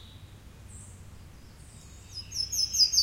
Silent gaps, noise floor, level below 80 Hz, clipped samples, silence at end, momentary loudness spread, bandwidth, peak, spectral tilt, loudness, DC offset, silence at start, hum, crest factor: none; -49 dBFS; -52 dBFS; under 0.1%; 0 s; 27 LU; 16 kHz; -10 dBFS; 0.5 dB/octave; -26 LUFS; under 0.1%; 0 s; none; 22 dB